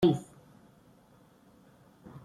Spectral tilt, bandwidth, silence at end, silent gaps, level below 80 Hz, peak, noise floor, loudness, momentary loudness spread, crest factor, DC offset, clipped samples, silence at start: -8 dB/octave; 13.5 kHz; 0.05 s; none; -64 dBFS; -14 dBFS; -61 dBFS; -31 LUFS; 28 LU; 22 dB; under 0.1%; under 0.1%; 0 s